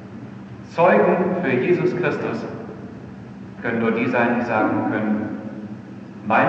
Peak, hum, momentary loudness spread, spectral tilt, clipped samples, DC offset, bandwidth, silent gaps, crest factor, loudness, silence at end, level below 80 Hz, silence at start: -4 dBFS; none; 20 LU; -8 dB/octave; under 0.1%; under 0.1%; 7.6 kHz; none; 18 dB; -20 LUFS; 0 s; -58 dBFS; 0 s